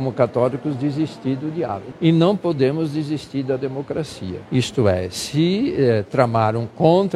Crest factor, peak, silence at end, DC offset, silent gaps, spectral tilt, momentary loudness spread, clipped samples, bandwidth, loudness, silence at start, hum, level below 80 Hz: 20 dB; 0 dBFS; 0 s; under 0.1%; none; -7 dB/octave; 9 LU; under 0.1%; 13 kHz; -20 LUFS; 0 s; none; -52 dBFS